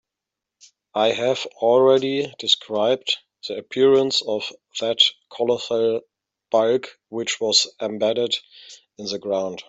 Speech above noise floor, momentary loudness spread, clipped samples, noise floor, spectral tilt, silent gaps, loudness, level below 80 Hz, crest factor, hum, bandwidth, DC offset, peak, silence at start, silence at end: 64 dB; 12 LU; under 0.1%; -86 dBFS; -3 dB/octave; none; -21 LUFS; -70 dBFS; 20 dB; none; 8.2 kHz; under 0.1%; -2 dBFS; 0.95 s; 0.05 s